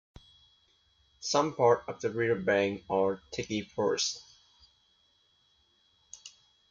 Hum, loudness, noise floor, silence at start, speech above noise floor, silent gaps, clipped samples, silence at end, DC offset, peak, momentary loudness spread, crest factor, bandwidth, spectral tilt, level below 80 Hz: none; -30 LUFS; -69 dBFS; 1.2 s; 40 dB; none; under 0.1%; 0.4 s; under 0.1%; -12 dBFS; 22 LU; 22 dB; 7.6 kHz; -4 dB/octave; -66 dBFS